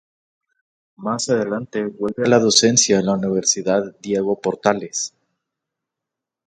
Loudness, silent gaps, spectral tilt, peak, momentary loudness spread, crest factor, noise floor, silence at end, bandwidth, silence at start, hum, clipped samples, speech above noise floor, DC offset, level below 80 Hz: -18 LUFS; none; -3 dB/octave; 0 dBFS; 13 LU; 20 dB; -85 dBFS; 1.4 s; 11 kHz; 1 s; none; under 0.1%; 66 dB; under 0.1%; -60 dBFS